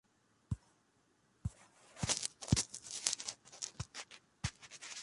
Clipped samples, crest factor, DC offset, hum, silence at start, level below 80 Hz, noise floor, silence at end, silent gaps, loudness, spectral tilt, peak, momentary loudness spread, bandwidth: under 0.1%; 32 dB; under 0.1%; none; 0.5 s; -56 dBFS; -74 dBFS; 0 s; none; -40 LUFS; -3 dB/octave; -10 dBFS; 13 LU; 11.5 kHz